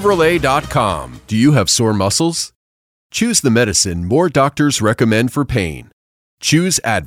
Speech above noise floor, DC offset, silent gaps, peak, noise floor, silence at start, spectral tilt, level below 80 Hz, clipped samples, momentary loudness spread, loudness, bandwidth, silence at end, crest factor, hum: over 76 dB; under 0.1%; 2.55-3.10 s, 5.93-6.38 s; -2 dBFS; under -90 dBFS; 0 s; -4 dB/octave; -40 dBFS; under 0.1%; 9 LU; -15 LUFS; 16.5 kHz; 0 s; 14 dB; none